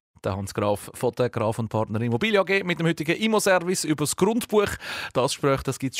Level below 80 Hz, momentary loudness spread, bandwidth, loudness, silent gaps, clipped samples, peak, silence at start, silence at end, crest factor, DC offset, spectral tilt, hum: -54 dBFS; 7 LU; 16 kHz; -24 LUFS; none; under 0.1%; -10 dBFS; 0.25 s; 0 s; 16 dB; under 0.1%; -4.5 dB/octave; none